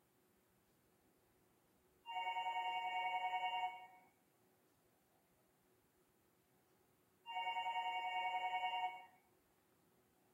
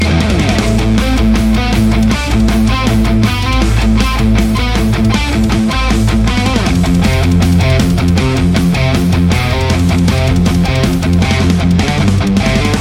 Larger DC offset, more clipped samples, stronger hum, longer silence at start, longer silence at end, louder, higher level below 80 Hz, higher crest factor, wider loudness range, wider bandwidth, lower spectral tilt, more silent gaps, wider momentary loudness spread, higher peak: neither; neither; neither; first, 2.05 s vs 0 s; first, 1.25 s vs 0 s; second, -43 LUFS vs -12 LUFS; second, under -90 dBFS vs -16 dBFS; first, 16 dB vs 10 dB; first, 7 LU vs 1 LU; about the same, 16 kHz vs 16.5 kHz; second, -1 dB/octave vs -6 dB/octave; neither; first, 15 LU vs 1 LU; second, -30 dBFS vs 0 dBFS